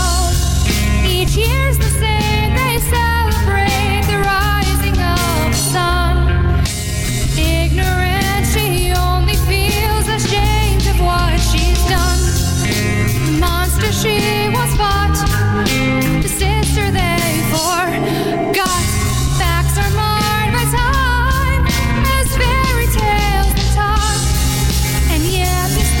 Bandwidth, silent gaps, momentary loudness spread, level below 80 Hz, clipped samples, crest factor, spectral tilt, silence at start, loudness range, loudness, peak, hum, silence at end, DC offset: 17 kHz; none; 1 LU; -18 dBFS; under 0.1%; 10 dB; -4.5 dB/octave; 0 s; 1 LU; -15 LUFS; -4 dBFS; none; 0 s; under 0.1%